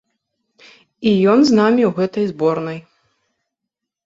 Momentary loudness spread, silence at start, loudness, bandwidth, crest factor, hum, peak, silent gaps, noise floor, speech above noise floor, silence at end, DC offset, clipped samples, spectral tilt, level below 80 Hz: 12 LU; 1 s; -16 LUFS; 7.8 kHz; 16 dB; none; -2 dBFS; none; -82 dBFS; 67 dB; 1.25 s; under 0.1%; under 0.1%; -6.5 dB/octave; -60 dBFS